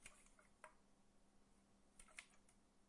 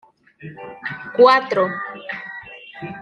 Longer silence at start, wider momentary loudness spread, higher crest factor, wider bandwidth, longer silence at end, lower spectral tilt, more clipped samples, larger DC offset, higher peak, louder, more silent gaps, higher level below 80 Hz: second, 0 s vs 0.4 s; second, 6 LU vs 23 LU; first, 30 dB vs 20 dB; first, 12 kHz vs 6.8 kHz; about the same, 0 s vs 0 s; second, -1.5 dB/octave vs -5.5 dB/octave; neither; neither; second, -38 dBFS vs -2 dBFS; second, -64 LUFS vs -18 LUFS; neither; second, -78 dBFS vs -66 dBFS